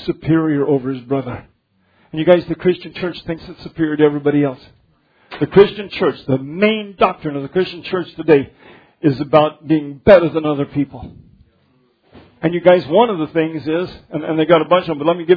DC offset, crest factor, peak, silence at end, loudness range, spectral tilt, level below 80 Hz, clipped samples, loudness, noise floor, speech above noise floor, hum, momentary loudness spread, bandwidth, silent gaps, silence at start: under 0.1%; 16 dB; 0 dBFS; 0 s; 3 LU; -9.5 dB/octave; -48 dBFS; under 0.1%; -16 LUFS; -59 dBFS; 44 dB; none; 13 LU; 5.4 kHz; none; 0 s